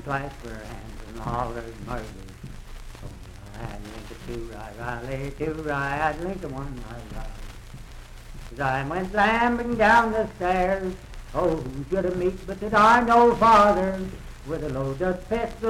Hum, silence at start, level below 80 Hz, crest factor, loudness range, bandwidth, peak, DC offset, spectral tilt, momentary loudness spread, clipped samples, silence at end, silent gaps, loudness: none; 0 s; -40 dBFS; 18 dB; 15 LU; 16 kHz; -6 dBFS; under 0.1%; -6 dB/octave; 25 LU; under 0.1%; 0 s; none; -23 LUFS